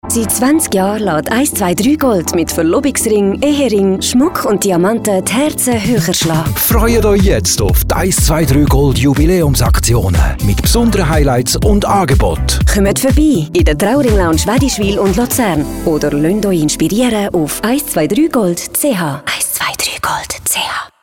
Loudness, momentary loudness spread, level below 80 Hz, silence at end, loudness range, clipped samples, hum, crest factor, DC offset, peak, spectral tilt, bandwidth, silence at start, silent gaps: -12 LUFS; 4 LU; -20 dBFS; 0.15 s; 2 LU; under 0.1%; none; 10 dB; under 0.1%; -2 dBFS; -5 dB/octave; 18 kHz; 0.05 s; none